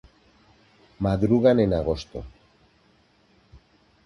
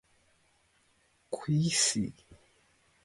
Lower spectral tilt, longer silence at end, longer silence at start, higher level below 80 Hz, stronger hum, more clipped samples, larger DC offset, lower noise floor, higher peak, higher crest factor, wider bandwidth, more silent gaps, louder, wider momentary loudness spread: first, -8.5 dB/octave vs -3.5 dB/octave; first, 1.75 s vs 0.7 s; second, 1 s vs 1.3 s; first, -44 dBFS vs -66 dBFS; neither; neither; neither; second, -61 dBFS vs -70 dBFS; first, -6 dBFS vs -14 dBFS; about the same, 20 dB vs 22 dB; about the same, 11 kHz vs 11.5 kHz; neither; first, -22 LUFS vs -30 LUFS; first, 20 LU vs 14 LU